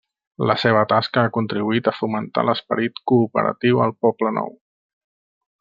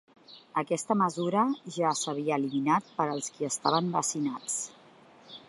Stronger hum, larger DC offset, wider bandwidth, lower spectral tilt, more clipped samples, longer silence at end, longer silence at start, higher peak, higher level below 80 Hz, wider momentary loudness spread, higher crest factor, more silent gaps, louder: neither; neither; second, 7.2 kHz vs 11.5 kHz; first, -8 dB/octave vs -4 dB/octave; neither; first, 1.1 s vs 0.1 s; about the same, 0.4 s vs 0.3 s; first, -2 dBFS vs -10 dBFS; first, -64 dBFS vs -80 dBFS; about the same, 6 LU vs 7 LU; about the same, 18 dB vs 22 dB; neither; first, -20 LUFS vs -29 LUFS